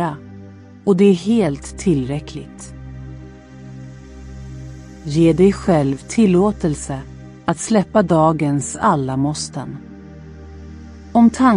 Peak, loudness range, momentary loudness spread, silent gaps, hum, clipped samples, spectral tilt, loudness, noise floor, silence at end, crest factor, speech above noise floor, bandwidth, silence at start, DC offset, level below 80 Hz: -2 dBFS; 8 LU; 24 LU; none; none; under 0.1%; -6.5 dB/octave; -17 LUFS; -39 dBFS; 0 s; 16 dB; 23 dB; 11 kHz; 0 s; under 0.1%; -40 dBFS